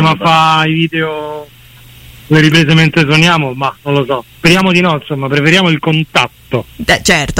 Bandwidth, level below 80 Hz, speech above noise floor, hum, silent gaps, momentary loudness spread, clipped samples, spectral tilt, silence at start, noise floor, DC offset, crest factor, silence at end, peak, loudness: 16.5 kHz; -38 dBFS; 27 dB; none; none; 10 LU; under 0.1%; -5 dB/octave; 0 s; -37 dBFS; under 0.1%; 12 dB; 0 s; 0 dBFS; -10 LUFS